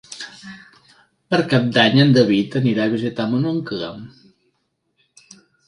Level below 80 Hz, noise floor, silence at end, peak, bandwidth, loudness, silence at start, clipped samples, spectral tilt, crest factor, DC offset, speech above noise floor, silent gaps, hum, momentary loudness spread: -60 dBFS; -70 dBFS; 1.6 s; 0 dBFS; 11 kHz; -17 LUFS; 0.1 s; under 0.1%; -6.5 dB/octave; 20 dB; under 0.1%; 52 dB; none; none; 21 LU